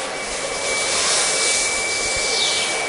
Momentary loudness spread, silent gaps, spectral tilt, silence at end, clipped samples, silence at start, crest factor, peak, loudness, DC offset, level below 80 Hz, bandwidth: 7 LU; none; 0.5 dB/octave; 0 s; under 0.1%; 0 s; 16 dB; -4 dBFS; -18 LUFS; under 0.1%; -48 dBFS; 11 kHz